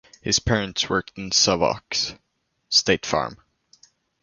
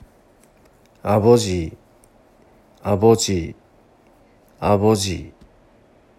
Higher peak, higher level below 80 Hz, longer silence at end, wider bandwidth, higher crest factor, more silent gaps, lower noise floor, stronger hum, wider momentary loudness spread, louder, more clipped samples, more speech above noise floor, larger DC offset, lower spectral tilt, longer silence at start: about the same, -4 dBFS vs -2 dBFS; first, -44 dBFS vs -50 dBFS; about the same, 0.9 s vs 0.9 s; second, 11 kHz vs 15.5 kHz; about the same, 20 dB vs 20 dB; neither; first, -72 dBFS vs -53 dBFS; neither; second, 8 LU vs 16 LU; about the same, -21 LUFS vs -19 LUFS; neither; first, 49 dB vs 36 dB; neither; second, -2.5 dB/octave vs -5.5 dB/octave; second, 0.25 s vs 1.05 s